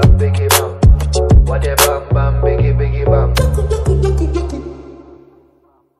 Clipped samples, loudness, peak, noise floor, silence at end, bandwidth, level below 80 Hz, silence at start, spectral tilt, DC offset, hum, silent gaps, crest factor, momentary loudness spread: 0.3%; -14 LUFS; 0 dBFS; -54 dBFS; 1 s; 15 kHz; -16 dBFS; 0 s; -5 dB/octave; under 0.1%; none; none; 12 dB; 8 LU